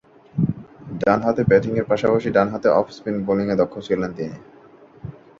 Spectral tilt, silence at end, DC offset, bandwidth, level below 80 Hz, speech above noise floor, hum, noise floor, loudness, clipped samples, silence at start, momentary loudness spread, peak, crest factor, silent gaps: -8 dB/octave; 0.3 s; under 0.1%; 7.4 kHz; -50 dBFS; 24 dB; none; -44 dBFS; -20 LUFS; under 0.1%; 0.35 s; 18 LU; -2 dBFS; 18 dB; none